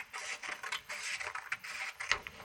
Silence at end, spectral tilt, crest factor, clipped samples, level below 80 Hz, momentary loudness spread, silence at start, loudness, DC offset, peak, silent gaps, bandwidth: 0 s; 0.5 dB/octave; 32 dB; under 0.1%; -68 dBFS; 5 LU; 0 s; -39 LUFS; under 0.1%; -10 dBFS; none; over 20 kHz